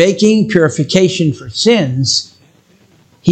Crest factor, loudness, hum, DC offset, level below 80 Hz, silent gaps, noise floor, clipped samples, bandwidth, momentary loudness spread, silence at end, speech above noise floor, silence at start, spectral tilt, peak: 14 dB; -12 LUFS; none; under 0.1%; -52 dBFS; none; -49 dBFS; under 0.1%; 9.2 kHz; 6 LU; 0 s; 37 dB; 0 s; -5 dB/octave; 0 dBFS